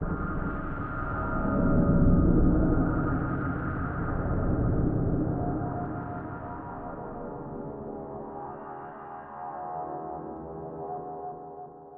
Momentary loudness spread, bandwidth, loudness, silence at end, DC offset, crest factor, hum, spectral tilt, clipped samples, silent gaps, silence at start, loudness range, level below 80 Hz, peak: 16 LU; 3 kHz; -30 LUFS; 0 s; under 0.1%; 18 dB; none; -11 dB/octave; under 0.1%; none; 0 s; 12 LU; -34 dBFS; -10 dBFS